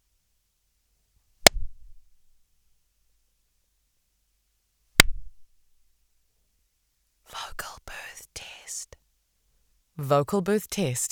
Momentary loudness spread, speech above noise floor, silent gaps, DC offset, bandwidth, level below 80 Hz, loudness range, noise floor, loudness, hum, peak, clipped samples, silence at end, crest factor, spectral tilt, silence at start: 21 LU; 47 dB; none; under 0.1%; over 20 kHz; -44 dBFS; 12 LU; -72 dBFS; -22 LUFS; none; 0 dBFS; under 0.1%; 0.05 s; 30 dB; -2.5 dB/octave; 1.45 s